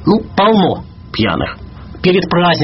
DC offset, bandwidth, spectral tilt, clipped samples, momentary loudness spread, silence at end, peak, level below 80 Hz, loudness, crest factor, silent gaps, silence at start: under 0.1%; 6 kHz; -4.5 dB/octave; under 0.1%; 14 LU; 0 s; 0 dBFS; -36 dBFS; -14 LUFS; 14 dB; none; 0 s